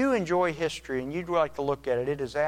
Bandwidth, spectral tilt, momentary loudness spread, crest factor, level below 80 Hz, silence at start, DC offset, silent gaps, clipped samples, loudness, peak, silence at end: 15.5 kHz; -5.5 dB/octave; 7 LU; 14 dB; -54 dBFS; 0 s; under 0.1%; none; under 0.1%; -28 LUFS; -12 dBFS; 0 s